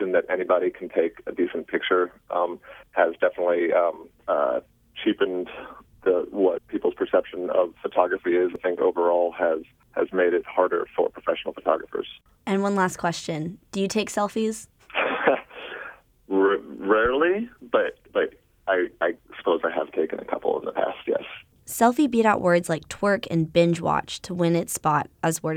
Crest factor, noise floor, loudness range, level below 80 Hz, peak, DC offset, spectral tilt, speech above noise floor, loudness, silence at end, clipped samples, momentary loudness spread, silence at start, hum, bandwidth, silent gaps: 20 dB; -43 dBFS; 4 LU; -60 dBFS; -4 dBFS; under 0.1%; -5 dB/octave; 19 dB; -24 LUFS; 0 s; under 0.1%; 10 LU; 0 s; none; 16.5 kHz; none